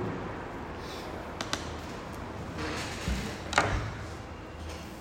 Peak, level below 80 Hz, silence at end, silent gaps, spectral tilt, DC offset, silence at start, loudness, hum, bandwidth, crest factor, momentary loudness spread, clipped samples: -6 dBFS; -44 dBFS; 0 s; none; -4.5 dB/octave; under 0.1%; 0 s; -35 LUFS; none; 16 kHz; 28 dB; 12 LU; under 0.1%